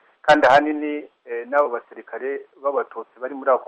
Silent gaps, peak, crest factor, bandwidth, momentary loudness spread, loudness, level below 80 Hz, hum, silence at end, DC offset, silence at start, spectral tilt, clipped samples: none; -4 dBFS; 18 dB; 8.8 kHz; 17 LU; -20 LUFS; -62 dBFS; none; 0 s; under 0.1%; 0.25 s; -4.5 dB/octave; under 0.1%